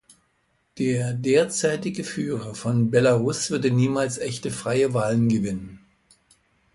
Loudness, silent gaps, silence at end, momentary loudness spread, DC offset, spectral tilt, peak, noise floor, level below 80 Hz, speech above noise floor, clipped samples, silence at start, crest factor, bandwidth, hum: -23 LUFS; none; 0.95 s; 9 LU; under 0.1%; -5.5 dB/octave; -6 dBFS; -68 dBFS; -58 dBFS; 46 dB; under 0.1%; 0.75 s; 18 dB; 11.5 kHz; none